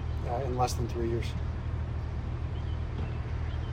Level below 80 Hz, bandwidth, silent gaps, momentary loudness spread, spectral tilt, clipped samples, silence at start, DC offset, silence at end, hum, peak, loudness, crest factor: -38 dBFS; 15 kHz; none; 5 LU; -6.5 dB/octave; under 0.1%; 0 s; under 0.1%; 0 s; none; -16 dBFS; -33 LUFS; 16 dB